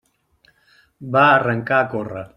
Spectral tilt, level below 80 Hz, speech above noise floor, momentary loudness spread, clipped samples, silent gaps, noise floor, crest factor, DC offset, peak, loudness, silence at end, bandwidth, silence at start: -7.5 dB/octave; -58 dBFS; 42 dB; 13 LU; under 0.1%; none; -59 dBFS; 18 dB; under 0.1%; -2 dBFS; -17 LUFS; 0.1 s; 10 kHz; 1 s